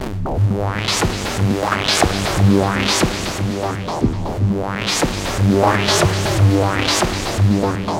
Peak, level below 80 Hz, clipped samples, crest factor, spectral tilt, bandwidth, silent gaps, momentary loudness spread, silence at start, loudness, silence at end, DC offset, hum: 0 dBFS; -32 dBFS; under 0.1%; 16 dB; -4.5 dB/octave; 16.5 kHz; none; 6 LU; 0 s; -17 LUFS; 0 s; under 0.1%; none